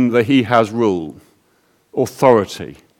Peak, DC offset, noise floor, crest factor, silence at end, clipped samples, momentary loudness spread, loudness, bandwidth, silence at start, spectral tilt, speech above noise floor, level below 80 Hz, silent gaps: 0 dBFS; under 0.1%; -59 dBFS; 16 dB; 0.25 s; under 0.1%; 14 LU; -16 LUFS; 18 kHz; 0 s; -6 dB/octave; 43 dB; -56 dBFS; none